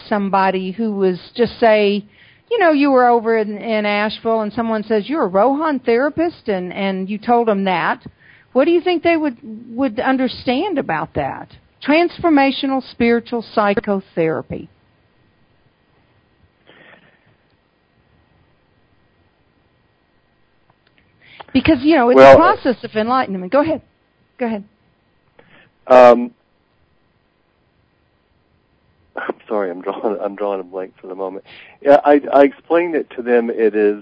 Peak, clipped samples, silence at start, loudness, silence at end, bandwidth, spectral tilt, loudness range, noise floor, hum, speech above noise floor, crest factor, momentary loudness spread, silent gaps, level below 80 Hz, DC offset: 0 dBFS; 0.3%; 0.05 s; -16 LUFS; 0 s; 8 kHz; -7 dB/octave; 12 LU; -61 dBFS; none; 45 dB; 18 dB; 14 LU; none; -50 dBFS; under 0.1%